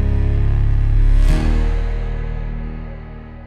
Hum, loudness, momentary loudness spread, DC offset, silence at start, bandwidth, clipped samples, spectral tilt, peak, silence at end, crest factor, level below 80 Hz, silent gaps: none; -20 LUFS; 14 LU; under 0.1%; 0 s; 5.4 kHz; under 0.1%; -8 dB/octave; -4 dBFS; 0 s; 12 dB; -16 dBFS; none